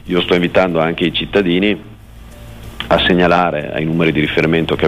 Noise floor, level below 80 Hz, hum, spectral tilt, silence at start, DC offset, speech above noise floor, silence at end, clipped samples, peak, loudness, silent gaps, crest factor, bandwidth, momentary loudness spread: -36 dBFS; -36 dBFS; none; -7 dB/octave; 0.05 s; under 0.1%; 22 dB; 0 s; under 0.1%; -2 dBFS; -14 LUFS; none; 12 dB; 15 kHz; 8 LU